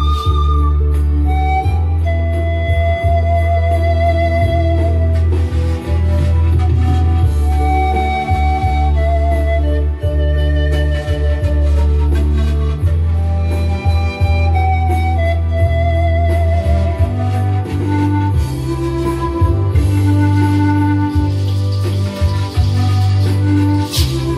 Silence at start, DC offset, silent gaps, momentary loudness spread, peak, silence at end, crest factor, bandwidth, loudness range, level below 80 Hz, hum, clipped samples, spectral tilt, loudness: 0 s; under 0.1%; none; 3 LU; -2 dBFS; 0 s; 12 dB; 12.5 kHz; 1 LU; -18 dBFS; none; under 0.1%; -7.5 dB/octave; -15 LUFS